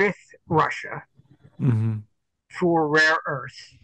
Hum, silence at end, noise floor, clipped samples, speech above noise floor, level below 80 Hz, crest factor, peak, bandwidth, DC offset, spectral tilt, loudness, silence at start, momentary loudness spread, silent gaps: none; 0.2 s; -55 dBFS; under 0.1%; 33 dB; -60 dBFS; 18 dB; -6 dBFS; 9 kHz; under 0.1%; -6 dB/octave; -22 LUFS; 0 s; 20 LU; none